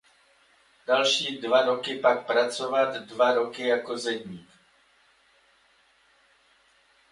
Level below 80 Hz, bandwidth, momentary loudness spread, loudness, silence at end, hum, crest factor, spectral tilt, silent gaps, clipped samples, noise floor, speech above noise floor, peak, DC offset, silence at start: -76 dBFS; 11.5 kHz; 10 LU; -25 LUFS; 2.7 s; none; 22 dB; -2.5 dB/octave; none; under 0.1%; -63 dBFS; 38 dB; -8 dBFS; under 0.1%; 0.9 s